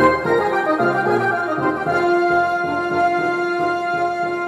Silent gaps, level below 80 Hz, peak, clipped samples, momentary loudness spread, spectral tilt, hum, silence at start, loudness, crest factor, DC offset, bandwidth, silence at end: none; -52 dBFS; -4 dBFS; under 0.1%; 4 LU; -6.5 dB/octave; none; 0 s; -18 LUFS; 14 dB; under 0.1%; 12.5 kHz; 0 s